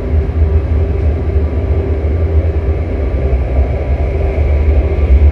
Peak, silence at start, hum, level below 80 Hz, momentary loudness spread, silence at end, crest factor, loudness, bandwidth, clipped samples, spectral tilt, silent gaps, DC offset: 0 dBFS; 0 s; none; -14 dBFS; 4 LU; 0 s; 12 dB; -14 LUFS; 4.2 kHz; under 0.1%; -10 dB/octave; none; 0.1%